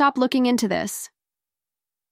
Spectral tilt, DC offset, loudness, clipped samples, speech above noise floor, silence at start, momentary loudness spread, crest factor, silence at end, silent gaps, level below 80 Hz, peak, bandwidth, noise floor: -4 dB/octave; under 0.1%; -22 LUFS; under 0.1%; 69 dB; 0 s; 14 LU; 16 dB; 1.05 s; none; -64 dBFS; -6 dBFS; 16 kHz; -90 dBFS